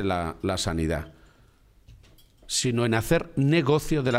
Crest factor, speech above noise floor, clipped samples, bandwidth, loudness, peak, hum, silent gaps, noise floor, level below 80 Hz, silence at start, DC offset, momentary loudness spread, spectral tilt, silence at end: 18 dB; 33 dB; under 0.1%; 16 kHz; -25 LUFS; -8 dBFS; none; none; -57 dBFS; -42 dBFS; 0 s; under 0.1%; 7 LU; -5 dB/octave; 0 s